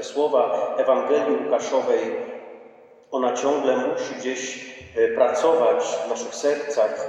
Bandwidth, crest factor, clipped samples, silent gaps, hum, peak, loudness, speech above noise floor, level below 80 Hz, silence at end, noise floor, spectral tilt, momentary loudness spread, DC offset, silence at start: 10 kHz; 16 dB; under 0.1%; none; none; -6 dBFS; -22 LUFS; 27 dB; -70 dBFS; 0 s; -49 dBFS; -3 dB/octave; 11 LU; under 0.1%; 0 s